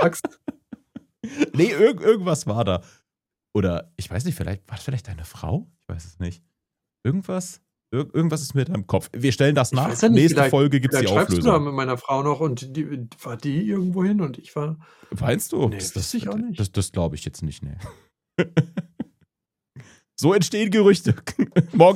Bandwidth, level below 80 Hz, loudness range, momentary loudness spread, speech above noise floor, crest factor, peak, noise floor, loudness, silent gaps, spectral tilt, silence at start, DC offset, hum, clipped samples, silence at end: 16.5 kHz; -48 dBFS; 10 LU; 18 LU; 66 dB; 22 dB; 0 dBFS; -87 dBFS; -22 LUFS; none; -6 dB/octave; 0 s; under 0.1%; none; under 0.1%; 0 s